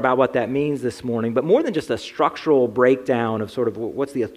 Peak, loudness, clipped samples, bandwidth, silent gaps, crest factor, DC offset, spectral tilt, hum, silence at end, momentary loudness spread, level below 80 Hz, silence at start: -4 dBFS; -21 LUFS; under 0.1%; 13 kHz; none; 18 dB; under 0.1%; -6.5 dB/octave; none; 0 s; 7 LU; -58 dBFS; 0 s